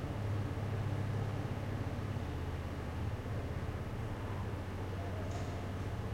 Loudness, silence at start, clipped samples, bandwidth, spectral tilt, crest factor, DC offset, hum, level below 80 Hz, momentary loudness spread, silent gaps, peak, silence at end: -40 LUFS; 0 s; under 0.1%; 16 kHz; -7 dB/octave; 12 dB; under 0.1%; none; -48 dBFS; 4 LU; none; -26 dBFS; 0 s